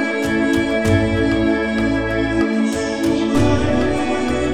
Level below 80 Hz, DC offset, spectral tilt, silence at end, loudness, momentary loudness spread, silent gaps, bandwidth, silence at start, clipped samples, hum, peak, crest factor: -32 dBFS; under 0.1%; -6 dB/octave; 0 s; -18 LUFS; 3 LU; none; 14.5 kHz; 0 s; under 0.1%; none; -4 dBFS; 12 dB